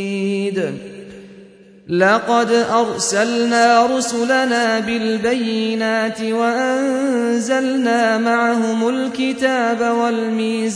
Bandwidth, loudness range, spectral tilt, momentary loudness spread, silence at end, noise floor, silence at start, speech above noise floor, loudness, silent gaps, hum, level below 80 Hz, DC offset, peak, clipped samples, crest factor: 10.5 kHz; 2 LU; -4 dB/octave; 6 LU; 0 s; -43 dBFS; 0 s; 27 dB; -17 LUFS; none; none; -60 dBFS; under 0.1%; -2 dBFS; under 0.1%; 16 dB